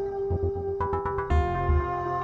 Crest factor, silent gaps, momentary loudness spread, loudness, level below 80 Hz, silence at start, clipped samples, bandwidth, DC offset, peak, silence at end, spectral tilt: 14 dB; none; 4 LU; -28 LUFS; -32 dBFS; 0 s; under 0.1%; 7.2 kHz; under 0.1%; -12 dBFS; 0 s; -9 dB/octave